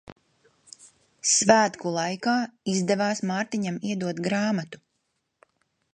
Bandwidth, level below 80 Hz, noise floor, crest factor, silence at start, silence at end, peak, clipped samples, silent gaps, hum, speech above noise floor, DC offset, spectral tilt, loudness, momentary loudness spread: 11 kHz; -68 dBFS; -76 dBFS; 24 dB; 0.1 s; 1.2 s; -2 dBFS; under 0.1%; 0.12-0.16 s; none; 52 dB; under 0.1%; -3.5 dB/octave; -25 LUFS; 10 LU